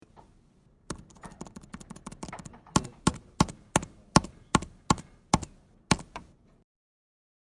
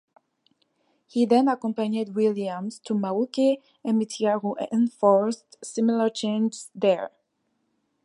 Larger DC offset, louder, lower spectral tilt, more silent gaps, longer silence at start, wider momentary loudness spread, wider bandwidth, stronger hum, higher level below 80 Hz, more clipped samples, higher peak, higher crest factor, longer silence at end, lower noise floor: neither; second, -29 LUFS vs -25 LUFS; second, -4 dB/octave vs -6 dB/octave; neither; second, 0.9 s vs 1.15 s; first, 20 LU vs 10 LU; about the same, 11.5 kHz vs 11.5 kHz; neither; first, -48 dBFS vs -78 dBFS; neither; first, -2 dBFS vs -8 dBFS; first, 30 dB vs 18 dB; first, 1.25 s vs 0.95 s; second, -62 dBFS vs -74 dBFS